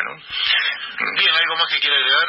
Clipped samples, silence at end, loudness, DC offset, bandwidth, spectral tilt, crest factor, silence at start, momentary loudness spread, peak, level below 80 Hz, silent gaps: under 0.1%; 0 s; -17 LUFS; under 0.1%; 8 kHz; -2 dB/octave; 16 dB; 0 s; 8 LU; -4 dBFS; -64 dBFS; none